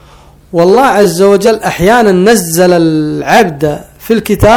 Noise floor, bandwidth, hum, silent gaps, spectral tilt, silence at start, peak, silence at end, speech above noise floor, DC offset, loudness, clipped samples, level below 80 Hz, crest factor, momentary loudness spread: -38 dBFS; 19.5 kHz; none; none; -5 dB/octave; 0.55 s; 0 dBFS; 0 s; 31 dB; under 0.1%; -8 LUFS; 4%; -32 dBFS; 8 dB; 7 LU